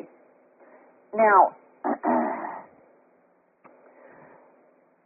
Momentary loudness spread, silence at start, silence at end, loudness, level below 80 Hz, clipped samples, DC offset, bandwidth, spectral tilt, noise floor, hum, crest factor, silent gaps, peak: 17 LU; 1.15 s; 2.4 s; -23 LUFS; -80 dBFS; under 0.1%; under 0.1%; 2.7 kHz; 2 dB/octave; -64 dBFS; none; 22 dB; none; -4 dBFS